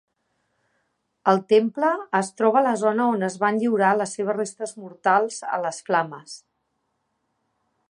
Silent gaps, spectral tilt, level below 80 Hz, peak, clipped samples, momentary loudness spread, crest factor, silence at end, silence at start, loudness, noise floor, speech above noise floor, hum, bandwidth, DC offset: none; -5 dB/octave; -78 dBFS; -4 dBFS; under 0.1%; 12 LU; 20 dB; 1.55 s; 1.25 s; -22 LUFS; -74 dBFS; 52 dB; none; 11 kHz; under 0.1%